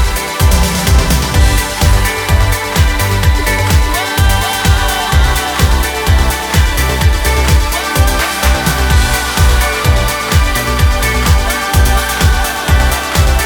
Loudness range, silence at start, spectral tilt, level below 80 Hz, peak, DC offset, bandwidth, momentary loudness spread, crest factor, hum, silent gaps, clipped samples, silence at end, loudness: 0 LU; 0 s; -4 dB/octave; -14 dBFS; 0 dBFS; under 0.1%; over 20 kHz; 2 LU; 10 dB; none; none; under 0.1%; 0 s; -12 LUFS